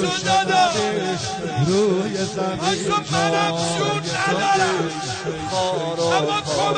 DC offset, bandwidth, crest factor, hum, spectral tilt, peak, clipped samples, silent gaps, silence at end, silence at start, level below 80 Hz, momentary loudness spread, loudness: under 0.1%; 9.4 kHz; 16 dB; none; -4 dB/octave; -6 dBFS; under 0.1%; none; 0 s; 0 s; -52 dBFS; 7 LU; -20 LUFS